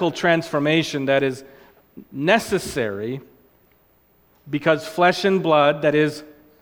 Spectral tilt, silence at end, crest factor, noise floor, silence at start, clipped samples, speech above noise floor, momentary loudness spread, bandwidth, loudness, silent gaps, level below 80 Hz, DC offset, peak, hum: -5 dB/octave; 0.3 s; 20 dB; -59 dBFS; 0 s; under 0.1%; 39 dB; 13 LU; 19 kHz; -20 LUFS; none; -56 dBFS; under 0.1%; -2 dBFS; none